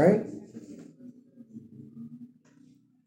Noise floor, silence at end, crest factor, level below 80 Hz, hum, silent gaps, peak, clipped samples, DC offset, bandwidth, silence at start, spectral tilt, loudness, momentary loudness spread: -59 dBFS; 0.8 s; 24 dB; -76 dBFS; none; none; -8 dBFS; under 0.1%; under 0.1%; 10 kHz; 0 s; -9 dB/octave; -32 LUFS; 21 LU